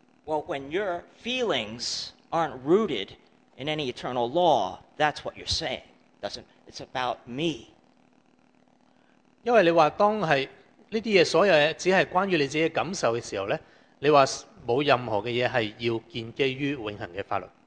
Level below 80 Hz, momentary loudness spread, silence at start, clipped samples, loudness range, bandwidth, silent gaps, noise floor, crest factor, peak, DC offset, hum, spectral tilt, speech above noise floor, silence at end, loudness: -58 dBFS; 14 LU; 0.25 s; under 0.1%; 9 LU; 9.8 kHz; none; -62 dBFS; 22 dB; -4 dBFS; under 0.1%; none; -4.5 dB/octave; 37 dB; 0.2 s; -26 LUFS